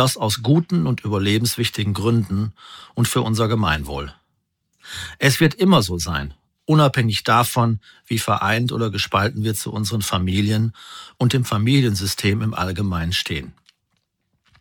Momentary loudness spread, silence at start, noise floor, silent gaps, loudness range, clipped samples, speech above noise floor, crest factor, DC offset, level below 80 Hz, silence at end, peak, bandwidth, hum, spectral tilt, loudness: 13 LU; 0 s; -72 dBFS; none; 3 LU; under 0.1%; 52 dB; 20 dB; under 0.1%; -44 dBFS; 1.1 s; -2 dBFS; 19.5 kHz; none; -5 dB/octave; -20 LUFS